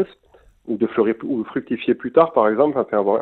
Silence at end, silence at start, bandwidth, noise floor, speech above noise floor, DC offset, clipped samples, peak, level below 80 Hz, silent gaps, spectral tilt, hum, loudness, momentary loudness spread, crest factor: 0 s; 0 s; 4.2 kHz; -53 dBFS; 35 dB; under 0.1%; under 0.1%; -2 dBFS; -60 dBFS; none; -9.5 dB/octave; none; -20 LUFS; 9 LU; 18 dB